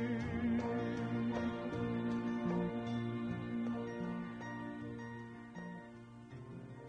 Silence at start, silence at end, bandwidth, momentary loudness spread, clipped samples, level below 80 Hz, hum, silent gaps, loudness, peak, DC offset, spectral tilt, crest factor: 0 s; 0 s; 7.8 kHz; 14 LU; under 0.1%; -64 dBFS; none; none; -40 LUFS; -26 dBFS; under 0.1%; -8 dB/octave; 14 dB